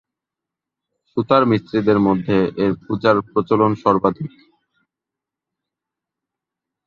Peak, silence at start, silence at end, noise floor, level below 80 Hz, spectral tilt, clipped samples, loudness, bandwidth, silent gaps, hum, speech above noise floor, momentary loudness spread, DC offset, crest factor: -2 dBFS; 1.15 s; 2.6 s; -86 dBFS; -52 dBFS; -9 dB/octave; under 0.1%; -18 LUFS; 7 kHz; none; none; 68 dB; 8 LU; under 0.1%; 18 dB